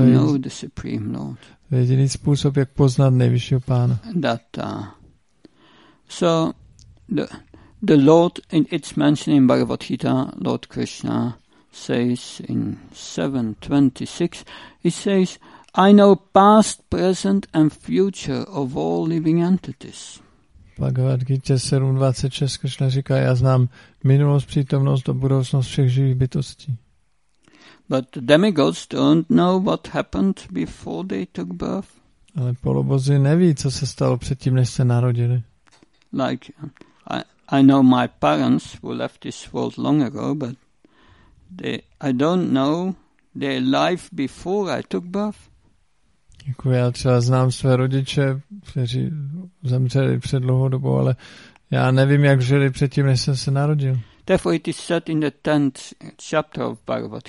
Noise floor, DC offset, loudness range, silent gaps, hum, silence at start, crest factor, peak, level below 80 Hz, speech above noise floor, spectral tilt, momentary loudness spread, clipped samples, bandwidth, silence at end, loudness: -66 dBFS; under 0.1%; 6 LU; none; none; 0 s; 20 dB; 0 dBFS; -48 dBFS; 47 dB; -7 dB/octave; 14 LU; under 0.1%; 11.5 kHz; 0 s; -20 LUFS